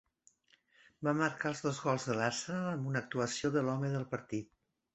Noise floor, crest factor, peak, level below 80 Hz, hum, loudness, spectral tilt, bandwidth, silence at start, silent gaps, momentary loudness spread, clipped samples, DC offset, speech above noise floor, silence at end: -71 dBFS; 20 dB; -16 dBFS; -72 dBFS; none; -35 LUFS; -5 dB/octave; 8.2 kHz; 1 s; none; 7 LU; under 0.1%; under 0.1%; 36 dB; 0.5 s